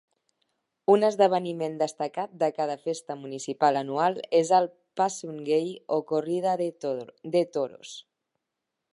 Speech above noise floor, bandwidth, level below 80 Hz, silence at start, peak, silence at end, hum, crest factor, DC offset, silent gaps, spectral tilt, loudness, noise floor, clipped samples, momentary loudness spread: 58 dB; 11.5 kHz; -82 dBFS; 0.9 s; -8 dBFS; 0.95 s; none; 20 dB; under 0.1%; none; -5 dB/octave; -27 LUFS; -84 dBFS; under 0.1%; 13 LU